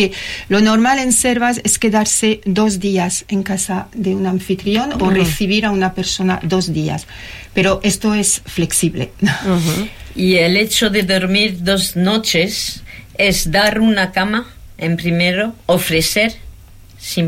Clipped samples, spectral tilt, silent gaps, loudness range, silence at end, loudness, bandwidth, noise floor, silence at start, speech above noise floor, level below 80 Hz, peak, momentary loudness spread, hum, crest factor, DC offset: under 0.1%; -4 dB/octave; none; 3 LU; 0 s; -15 LUFS; 16.5 kHz; -39 dBFS; 0 s; 24 dB; -36 dBFS; -2 dBFS; 8 LU; none; 12 dB; under 0.1%